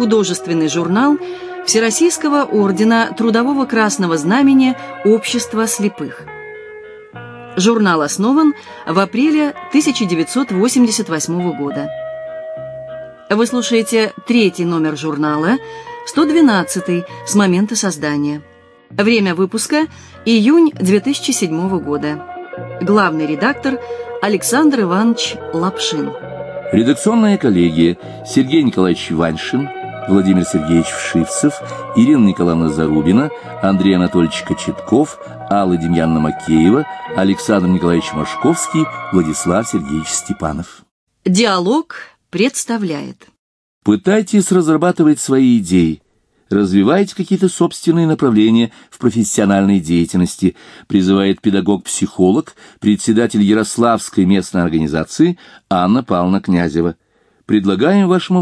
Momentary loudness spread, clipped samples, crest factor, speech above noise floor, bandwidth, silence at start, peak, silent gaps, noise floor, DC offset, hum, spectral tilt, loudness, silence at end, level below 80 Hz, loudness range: 11 LU; under 0.1%; 14 dB; 20 dB; 11 kHz; 0 s; 0 dBFS; 40.91-41.07 s, 43.39-43.81 s; -34 dBFS; under 0.1%; none; -5 dB/octave; -14 LUFS; 0 s; -46 dBFS; 3 LU